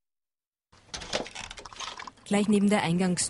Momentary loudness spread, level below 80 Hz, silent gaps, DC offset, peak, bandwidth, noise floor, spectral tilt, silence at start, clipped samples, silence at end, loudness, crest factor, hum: 17 LU; -58 dBFS; none; under 0.1%; -12 dBFS; 11.5 kHz; under -90 dBFS; -4.5 dB/octave; 0.95 s; under 0.1%; 0 s; -28 LUFS; 16 dB; none